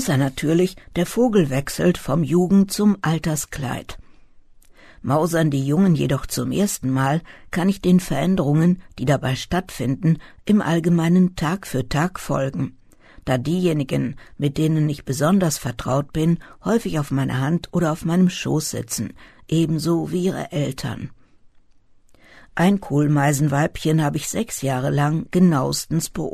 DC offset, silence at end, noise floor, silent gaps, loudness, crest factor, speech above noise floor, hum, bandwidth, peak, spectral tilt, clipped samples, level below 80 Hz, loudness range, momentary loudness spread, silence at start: under 0.1%; 0 s; -52 dBFS; none; -21 LUFS; 16 dB; 32 dB; none; 13.5 kHz; -4 dBFS; -6 dB/octave; under 0.1%; -44 dBFS; 4 LU; 8 LU; 0 s